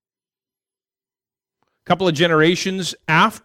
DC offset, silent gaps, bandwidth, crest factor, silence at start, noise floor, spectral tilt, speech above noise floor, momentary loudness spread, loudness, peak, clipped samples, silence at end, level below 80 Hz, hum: under 0.1%; none; 16 kHz; 18 dB; 1.9 s; under -90 dBFS; -4.5 dB/octave; over 73 dB; 8 LU; -17 LUFS; -2 dBFS; under 0.1%; 0.05 s; -60 dBFS; none